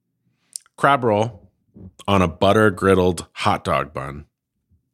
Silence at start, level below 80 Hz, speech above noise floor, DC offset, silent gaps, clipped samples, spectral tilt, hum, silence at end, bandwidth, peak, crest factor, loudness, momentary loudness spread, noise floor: 0.8 s; -48 dBFS; 50 dB; under 0.1%; none; under 0.1%; -5.5 dB/octave; none; 0.7 s; 15.5 kHz; 0 dBFS; 20 dB; -19 LUFS; 19 LU; -68 dBFS